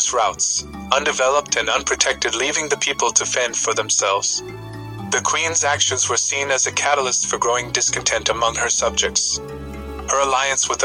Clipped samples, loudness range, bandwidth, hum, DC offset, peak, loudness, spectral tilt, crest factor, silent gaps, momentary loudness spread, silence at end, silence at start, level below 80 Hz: under 0.1%; 1 LU; 16.5 kHz; none; under 0.1%; 0 dBFS; -18 LUFS; -0.5 dB/octave; 20 dB; none; 6 LU; 0 s; 0 s; -44 dBFS